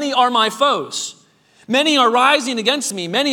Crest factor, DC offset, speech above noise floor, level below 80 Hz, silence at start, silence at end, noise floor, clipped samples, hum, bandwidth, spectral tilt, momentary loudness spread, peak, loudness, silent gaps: 16 dB; under 0.1%; 37 dB; -76 dBFS; 0 s; 0 s; -53 dBFS; under 0.1%; none; 19 kHz; -2 dB/octave; 10 LU; 0 dBFS; -16 LUFS; none